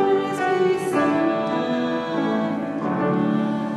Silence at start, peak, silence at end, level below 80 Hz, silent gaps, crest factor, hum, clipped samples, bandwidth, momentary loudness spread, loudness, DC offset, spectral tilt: 0 s; -8 dBFS; 0 s; -62 dBFS; none; 14 dB; none; under 0.1%; 13.5 kHz; 4 LU; -22 LUFS; under 0.1%; -6.5 dB/octave